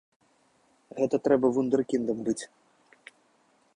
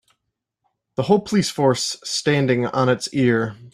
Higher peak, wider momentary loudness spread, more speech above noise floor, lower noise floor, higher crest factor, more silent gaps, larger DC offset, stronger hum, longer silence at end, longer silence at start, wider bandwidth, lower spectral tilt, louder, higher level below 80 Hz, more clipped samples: second, -10 dBFS vs -4 dBFS; first, 13 LU vs 5 LU; second, 40 dB vs 59 dB; second, -66 dBFS vs -78 dBFS; about the same, 20 dB vs 18 dB; neither; neither; neither; first, 1.35 s vs 0.05 s; about the same, 0.95 s vs 1 s; second, 10.5 kHz vs 15 kHz; about the same, -6 dB/octave vs -5 dB/octave; second, -27 LUFS vs -20 LUFS; second, -68 dBFS vs -58 dBFS; neither